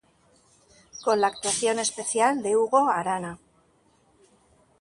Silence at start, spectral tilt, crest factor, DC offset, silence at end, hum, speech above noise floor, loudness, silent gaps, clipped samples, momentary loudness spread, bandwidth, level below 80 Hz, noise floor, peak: 0.95 s; -2.5 dB/octave; 18 dB; under 0.1%; 1.45 s; none; 39 dB; -24 LUFS; none; under 0.1%; 12 LU; 11.5 kHz; -68 dBFS; -63 dBFS; -8 dBFS